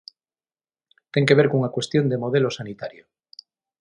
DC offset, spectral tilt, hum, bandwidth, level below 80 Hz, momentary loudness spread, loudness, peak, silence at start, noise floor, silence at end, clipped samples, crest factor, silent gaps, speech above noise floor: under 0.1%; -6.5 dB/octave; none; 10.5 kHz; -64 dBFS; 17 LU; -21 LUFS; -2 dBFS; 1.15 s; under -90 dBFS; 0.9 s; under 0.1%; 22 dB; none; over 69 dB